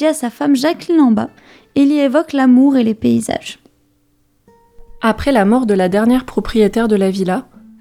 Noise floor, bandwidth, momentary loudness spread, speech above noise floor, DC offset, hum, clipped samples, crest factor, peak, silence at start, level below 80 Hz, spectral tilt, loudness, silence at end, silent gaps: -58 dBFS; 15 kHz; 8 LU; 45 dB; under 0.1%; none; under 0.1%; 14 dB; 0 dBFS; 0 s; -40 dBFS; -6 dB/octave; -14 LUFS; 0.4 s; none